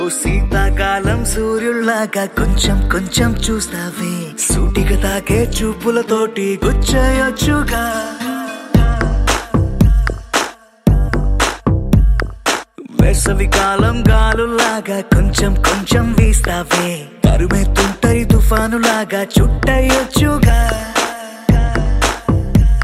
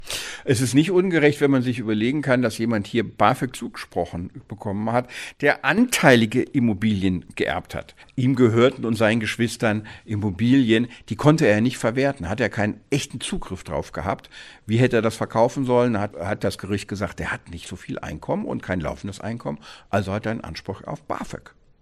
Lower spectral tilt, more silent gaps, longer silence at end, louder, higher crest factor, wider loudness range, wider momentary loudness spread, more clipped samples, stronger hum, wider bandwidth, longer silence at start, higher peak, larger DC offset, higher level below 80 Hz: about the same, -5 dB/octave vs -6 dB/octave; neither; second, 0 s vs 0.45 s; first, -15 LUFS vs -22 LUFS; second, 14 dB vs 22 dB; second, 3 LU vs 8 LU; second, 5 LU vs 15 LU; neither; neither; first, 15.5 kHz vs 14 kHz; about the same, 0 s vs 0 s; about the same, 0 dBFS vs 0 dBFS; neither; first, -18 dBFS vs -48 dBFS